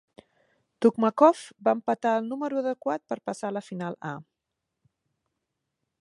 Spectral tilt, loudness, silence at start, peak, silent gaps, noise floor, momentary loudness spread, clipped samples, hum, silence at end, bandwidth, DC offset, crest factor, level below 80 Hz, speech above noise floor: -6.5 dB/octave; -26 LUFS; 0.8 s; -4 dBFS; none; -84 dBFS; 14 LU; under 0.1%; none; 1.8 s; 11.5 kHz; under 0.1%; 24 dB; -80 dBFS; 58 dB